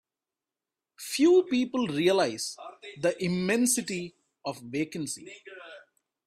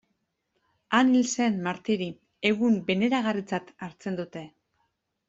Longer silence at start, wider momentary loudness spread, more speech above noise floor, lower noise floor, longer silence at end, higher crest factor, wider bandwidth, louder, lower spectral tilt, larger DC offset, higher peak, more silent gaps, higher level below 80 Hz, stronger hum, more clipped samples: about the same, 1 s vs 0.9 s; first, 21 LU vs 14 LU; first, over 62 dB vs 51 dB; first, under -90 dBFS vs -77 dBFS; second, 0.45 s vs 0.8 s; about the same, 18 dB vs 20 dB; first, 15.5 kHz vs 8 kHz; about the same, -27 LUFS vs -26 LUFS; about the same, -4 dB/octave vs -4.5 dB/octave; neither; second, -12 dBFS vs -8 dBFS; neither; about the same, -70 dBFS vs -70 dBFS; neither; neither